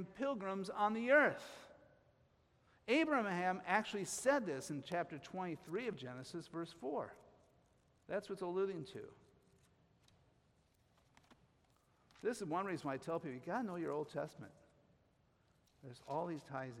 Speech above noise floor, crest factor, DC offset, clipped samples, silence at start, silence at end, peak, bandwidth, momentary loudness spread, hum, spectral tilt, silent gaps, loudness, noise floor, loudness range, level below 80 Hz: 35 dB; 24 dB; under 0.1%; under 0.1%; 0 s; 0 s; -18 dBFS; 15.5 kHz; 17 LU; none; -4.5 dB/octave; none; -40 LUFS; -75 dBFS; 10 LU; -80 dBFS